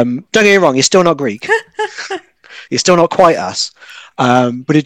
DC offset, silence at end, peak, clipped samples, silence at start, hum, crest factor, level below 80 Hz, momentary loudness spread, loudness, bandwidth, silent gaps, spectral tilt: under 0.1%; 0 s; 0 dBFS; 1%; 0 s; none; 12 dB; -54 dBFS; 13 LU; -12 LUFS; 17.5 kHz; none; -4 dB/octave